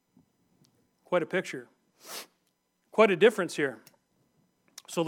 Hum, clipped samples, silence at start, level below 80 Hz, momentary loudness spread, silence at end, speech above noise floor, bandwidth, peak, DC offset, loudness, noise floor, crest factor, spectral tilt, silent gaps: none; under 0.1%; 1.1 s; under -90 dBFS; 20 LU; 0 s; 49 dB; 17.5 kHz; -8 dBFS; under 0.1%; -27 LUFS; -75 dBFS; 24 dB; -4.5 dB/octave; none